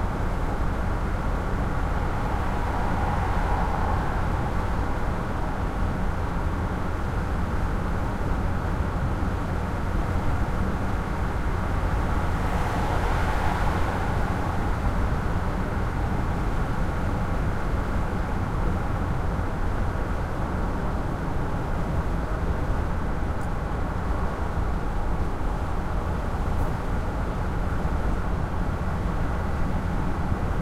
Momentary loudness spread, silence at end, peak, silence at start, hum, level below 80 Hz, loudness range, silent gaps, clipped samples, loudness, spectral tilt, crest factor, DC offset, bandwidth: 3 LU; 0 s; -10 dBFS; 0 s; none; -28 dBFS; 2 LU; none; under 0.1%; -28 LUFS; -7.5 dB/octave; 14 dB; under 0.1%; 14 kHz